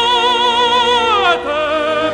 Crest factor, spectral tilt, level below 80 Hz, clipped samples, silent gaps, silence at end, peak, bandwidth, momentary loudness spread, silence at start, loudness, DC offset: 12 dB; -2 dB/octave; -44 dBFS; under 0.1%; none; 0 s; -2 dBFS; 11.5 kHz; 4 LU; 0 s; -13 LUFS; under 0.1%